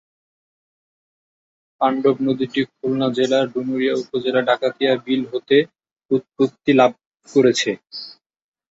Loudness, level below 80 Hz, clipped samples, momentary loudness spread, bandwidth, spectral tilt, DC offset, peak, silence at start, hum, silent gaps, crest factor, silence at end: -19 LUFS; -64 dBFS; under 0.1%; 7 LU; 8 kHz; -5 dB/octave; under 0.1%; -2 dBFS; 1.8 s; none; 6.05-6.09 s, 7.06-7.11 s; 18 dB; 0.6 s